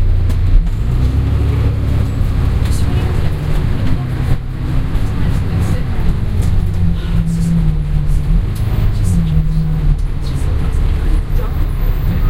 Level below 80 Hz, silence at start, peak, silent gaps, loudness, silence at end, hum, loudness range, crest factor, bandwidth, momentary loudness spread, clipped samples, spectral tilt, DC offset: -16 dBFS; 0 s; 0 dBFS; none; -17 LUFS; 0 s; none; 2 LU; 12 dB; 15.5 kHz; 4 LU; under 0.1%; -7.5 dB/octave; under 0.1%